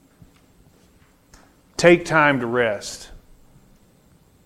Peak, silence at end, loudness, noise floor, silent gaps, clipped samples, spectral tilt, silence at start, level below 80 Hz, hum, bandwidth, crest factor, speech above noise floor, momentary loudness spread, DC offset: 0 dBFS; 1.3 s; -18 LUFS; -55 dBFS; none; under 0.1%; -5 dB/octave; 1.8 s; -52 dBFS; none; 13.5 kHz; 22 dB; 37 dB; 18 LU; under 0.1%